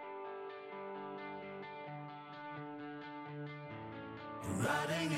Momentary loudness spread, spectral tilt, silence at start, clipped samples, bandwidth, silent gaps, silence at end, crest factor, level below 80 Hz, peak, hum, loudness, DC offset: 12 LU; -5 dB/octave; 0 s; under 0.1%; 16 kHz; none; 0 s; 20 dB; -76 dBFS; -24 dBFS; none; -44 LUFS; under 0.1%